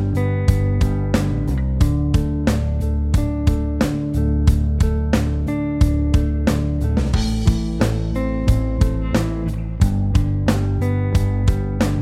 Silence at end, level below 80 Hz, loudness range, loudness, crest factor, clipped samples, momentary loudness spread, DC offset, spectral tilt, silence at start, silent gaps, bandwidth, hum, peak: 0 s; -22 dBFS; 1 LU; -20 LUFS; 16 dB; under 0.1%; 3 LU; under 0.1%; -7.5 dB/octave; 0 s; none; 14 kHz; none; 0 dBFS